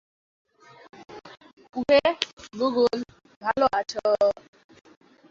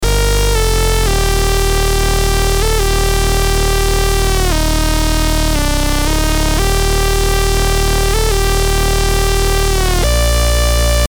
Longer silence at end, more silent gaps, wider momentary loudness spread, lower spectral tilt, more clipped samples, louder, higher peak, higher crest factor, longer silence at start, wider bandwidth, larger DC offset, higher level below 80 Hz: first, 1 s vs 0.05 s; first, 1.53-1.57 s, 2.33-2.37 s, 3.36-3.41 s vs none; first, 23 LU vs 2 LU; about the same, -4 dB/octave vs -4 dB/octave; neither; second, -24 LUFS vs -14 LUFS; about the same, -2 dBFS vs 0 dBFS; first, 24 dB vs 12 dB; first, 1 s vs 0 s; second, 7.6 kHz vs over 20 kHz; neither; second, -62 dBFS vs -14 dBFS